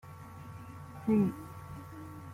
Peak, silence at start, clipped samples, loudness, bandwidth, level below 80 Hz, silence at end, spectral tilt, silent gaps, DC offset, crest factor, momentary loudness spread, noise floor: -18 dBFS; 0.05 s; under 0.1%; -32 LUFS; 16 kHz; -64 dBFS; 0 s; -8.5 dB/octave; none; under 0.1%; 18 dB; 19 LU; -48 dBFS